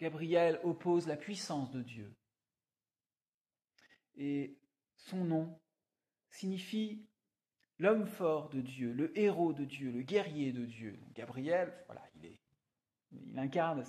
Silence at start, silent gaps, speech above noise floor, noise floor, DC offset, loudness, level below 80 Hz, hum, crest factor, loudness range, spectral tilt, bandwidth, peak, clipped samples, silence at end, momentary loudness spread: 0 s; 3.34-3.41 s; over 54 dB; under -90 dBFS; under 0.1%; -37 LUFS; -84 dBFS; none; 20 dB; 10 LU; -6.5 dB/octave; 14 kHz; -18 dBFS; under 0.1%; 0 s; 17 LU